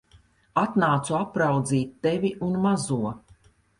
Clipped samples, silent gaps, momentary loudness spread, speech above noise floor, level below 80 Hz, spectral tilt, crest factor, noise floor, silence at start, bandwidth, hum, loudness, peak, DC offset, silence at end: under 0.1%; none; 6 LU; 34 dB; -58 dBFS; -6 dB/octave; 16 dB; -58 dBFS; 0.55 s; 11.5 kHz; none; -25 LUFS; -8 dBFS; under 0.1%; 0.6 s